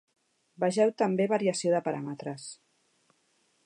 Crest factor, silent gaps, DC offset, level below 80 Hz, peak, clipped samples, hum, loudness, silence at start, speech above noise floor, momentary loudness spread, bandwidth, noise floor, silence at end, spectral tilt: 18 dB; none; under 0.1%; -82 dBFS; -14 dBFS; under 0.1%; none; -28 LUFS; 0.6 s; 43 dB; 13 LU; 11 kHz; -71 dBFS; 1.1 s; -5.5 dB/octave